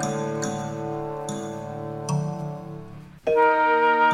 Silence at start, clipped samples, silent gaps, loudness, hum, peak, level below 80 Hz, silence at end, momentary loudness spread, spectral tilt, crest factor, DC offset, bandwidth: 0 s; under 0.1%; none; -25 LUFS; none; -8 dBFS; -56 dBFS; 0 s; 16 LU; -5.5 dB/octave; 16 dB; under 0.1%; 15 kHz